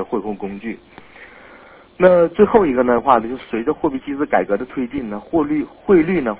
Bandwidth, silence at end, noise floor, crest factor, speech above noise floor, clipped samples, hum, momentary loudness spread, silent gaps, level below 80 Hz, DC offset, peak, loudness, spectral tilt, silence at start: 4 kHz; 0 s; -44 dBFS; 18 dB; 27 dB; under 0.1%; none; 14 LU; none; -48 dBFS; under 0.1%; 0 dBFS; -17 LUFS; -11 dB/octave; 0 s